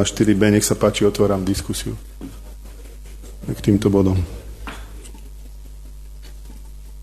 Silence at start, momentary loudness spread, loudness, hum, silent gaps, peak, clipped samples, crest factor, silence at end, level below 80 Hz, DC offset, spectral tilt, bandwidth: 0 s; 24 LU; -18 LUFS; 50 Hz at -35 dBFS; none; -2 dBFS; under 0.1%; 18 dB; 0 s; -36 dBFS; under 0.1%; -5.5 dB/octave; 13.5 kHz